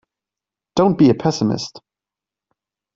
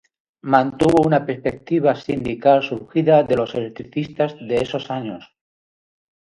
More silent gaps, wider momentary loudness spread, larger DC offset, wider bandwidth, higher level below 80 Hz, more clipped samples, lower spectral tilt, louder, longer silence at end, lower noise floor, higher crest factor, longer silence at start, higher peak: neither; about the same, 12 LU vs 12 LU; neither; second, 7.8 kHz vs 11.5 kHz; about the same, -56 dBFS vs -52 dBFS; neither; about the same, -6.5 dB/octave vs -7.5 dB/octave; about the same, -17 LUFS vs -19 LUFS; about the same, 1.2 s vs 1.1 s; about the same, -88 dBFS vs under -90 dBFS; about the same, 18 dB vs 20 dB; first, 0.75 s vs 0.45 s; about the same, -2 dBFS vs 0 dBFS